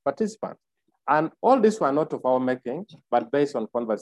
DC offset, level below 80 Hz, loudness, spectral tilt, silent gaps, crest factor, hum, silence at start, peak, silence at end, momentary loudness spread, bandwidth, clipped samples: under 0.1%; -74 dBFS; -24 LUFS; -6.5 dB/octave; none; 18 dB; none; 0.05 s; -6 dBFS; 0 s; 16 LU; 11.5 kHz; under 0.1%